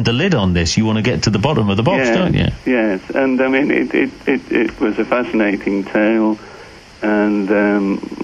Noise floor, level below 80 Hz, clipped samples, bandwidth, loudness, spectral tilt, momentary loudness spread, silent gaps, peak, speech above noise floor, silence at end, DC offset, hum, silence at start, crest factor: -38 dBFS; -38 dBFS; under 0.1%; 9.8 kHz; -16 LUFS; -6 dB/octave; 4 LU; none; 0 dBFS; 22 dB; 0 s; under 0.1%; none; 0 s; 16 dB